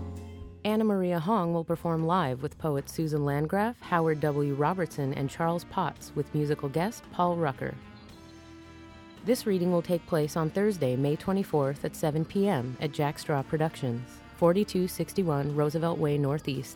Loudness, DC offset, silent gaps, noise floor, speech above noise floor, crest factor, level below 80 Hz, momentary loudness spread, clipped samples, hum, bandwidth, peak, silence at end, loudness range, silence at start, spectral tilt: -29 LUFS; under 0.1%; none; -49 dBFS; 21 dB; 18 dB; -56 dBFS; 11 LU; under 0.1%; none; 17.5 kHz; -10 dBFS; 0 s; 3 LU; 0 s; -7 dB/octave